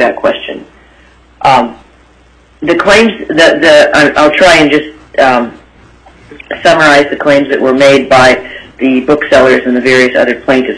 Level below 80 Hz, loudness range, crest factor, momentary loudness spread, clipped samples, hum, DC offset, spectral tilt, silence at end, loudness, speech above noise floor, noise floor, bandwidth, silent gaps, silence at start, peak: -38 dBFS; 3 LU; 8 dB; 12 LU; 2%; none; under 0.1%; -4 dB/octave; 0 s; -7 LUFS; 36 dB; -43 dBFS; 11 kHz; none; 0 s; 0 dBFS